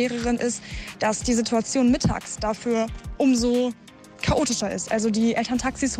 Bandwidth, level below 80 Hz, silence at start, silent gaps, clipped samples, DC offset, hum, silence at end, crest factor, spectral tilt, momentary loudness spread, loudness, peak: 13.5 kHz; -40 dBFS; 0 s; none; under 0.1%; under 0.1%; none; 0 s; 12 dB; -4.5 dB/octave; 8 LU; -24 LUFS; -10 dBFS